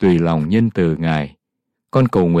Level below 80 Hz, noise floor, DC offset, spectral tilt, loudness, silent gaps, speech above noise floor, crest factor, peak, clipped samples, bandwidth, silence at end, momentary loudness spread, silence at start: -46 dBFS; -78 dBFS; under 0.1%; -9 dB/octave; -17 LUFS; none; 63 dB; 12 dB; -4 dBFS; under 0.1%; 8.2 kHz; 0 s; 6 LU; 0 s